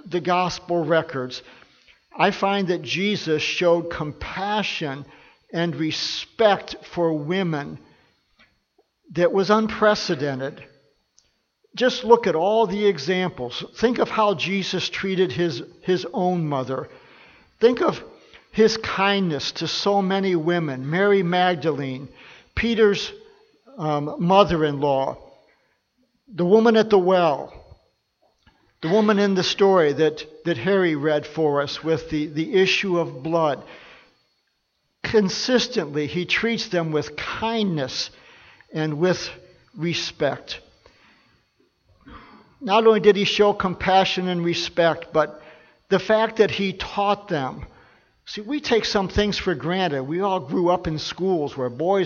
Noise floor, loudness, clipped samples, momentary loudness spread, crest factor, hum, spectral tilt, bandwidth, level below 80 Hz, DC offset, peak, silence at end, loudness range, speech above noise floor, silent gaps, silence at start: -72 dBFS; -22 LUFS; under 0.1%; 12 LU; 22 dB; none; -5.5 dB/octave; 7.2 kHz; -50 dBFS; under 0.1%; 0 dBFS; 0 s; 4 LU; 51 dB; none; 0.05 s